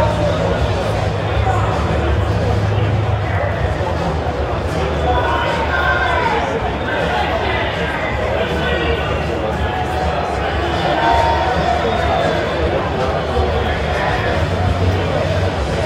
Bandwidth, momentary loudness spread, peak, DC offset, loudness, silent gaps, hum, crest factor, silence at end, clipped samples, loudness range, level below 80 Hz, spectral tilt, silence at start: 12.5 kHz; 4 LU; -2 dBFS; under 0.1%; -17 LUFS; none; none; 14 dB; 0 s; under 0.1%; 2 LU; -26 dBFS; -6.5 dB/octave; 0 s